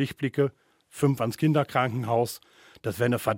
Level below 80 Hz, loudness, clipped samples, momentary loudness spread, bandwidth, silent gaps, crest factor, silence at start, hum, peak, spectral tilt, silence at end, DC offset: -64 dBFS; -27 LUFS; under 0.1%; 11 LU; 17 kHz; none; 18 dB; 0 s; none; -8 dBFS; -6.5 dB/octave; 0 s; under 0.1%